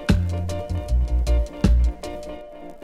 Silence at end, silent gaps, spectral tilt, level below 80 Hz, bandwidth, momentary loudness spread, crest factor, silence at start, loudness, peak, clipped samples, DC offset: 0 s; none; -7 dB/octave; -22 dBFS; 11 kHz; 16 LU; 18 dB; 0 s; -24 LUFS; -4 dBFS; under 0.1%; under 0.1%